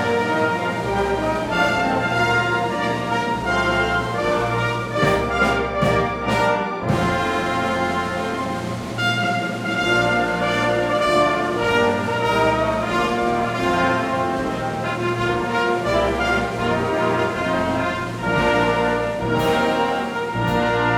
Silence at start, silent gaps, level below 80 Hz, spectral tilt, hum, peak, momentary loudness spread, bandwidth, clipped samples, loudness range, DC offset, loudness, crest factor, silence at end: 0 s; none; -40 dBFS; -5.5 dB/octave; none; -4 dBFS; 5 LU; 17 kHz; under 0.1%; 2 LU; under 0.1%; -20 LUFS; 16 dB; 0 s